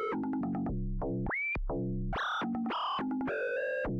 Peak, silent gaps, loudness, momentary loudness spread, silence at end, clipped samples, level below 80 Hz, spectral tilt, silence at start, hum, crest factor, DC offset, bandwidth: -26 dBFS; none; -34 LUFS; 3 LU; 0 s; under 0.1%; -42 dBFS; -7.5 dB/octave; 0 s; none; 6 dB; under 0.1%; 6.6 kHz